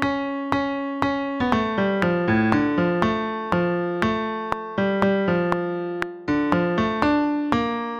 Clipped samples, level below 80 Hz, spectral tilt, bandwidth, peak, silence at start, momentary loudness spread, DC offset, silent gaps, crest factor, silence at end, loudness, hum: under 0.1%; -48 dBFS; -7.5 dB/octave; 8.8 kHz; -2 dBFS; 0 s; 6 LU; under 0.1%; none; 20 dB; 0 s; -23 LUFS; none